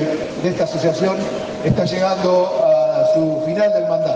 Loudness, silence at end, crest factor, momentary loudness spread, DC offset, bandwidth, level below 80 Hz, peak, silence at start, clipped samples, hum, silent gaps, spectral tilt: -17 LUFS; 0 s; 14 dB; 7 LU; under 0.1%; 8.6 kHz; -50 dBFS; -4 dBFS; 0 s; under 0.1%; none; none; -6.5 dB/octave